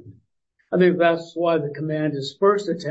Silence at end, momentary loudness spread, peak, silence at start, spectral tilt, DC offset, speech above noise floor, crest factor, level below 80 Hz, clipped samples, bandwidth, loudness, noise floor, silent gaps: 0 s; 9 LU; -4 dBFS; 0.05 s; -7 dB/octave; under 0.1%; 49 dB; 16 dB; -72 dBFS; under 0.1%; 8 kHz; -21 LUFS; -70 dBFS; none